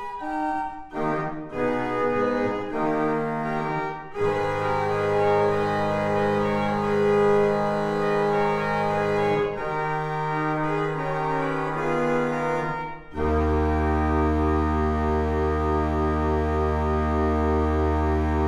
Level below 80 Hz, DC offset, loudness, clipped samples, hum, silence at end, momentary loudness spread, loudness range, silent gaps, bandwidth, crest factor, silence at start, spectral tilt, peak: -34 dBFS; under 0.1%; -24 LUFS; under 0.1%; none; 0 s; 5 LU; 3 LU; none; 11 kHz; 14 dB; 0 s; -7.5 dB/octave; -10 dBFS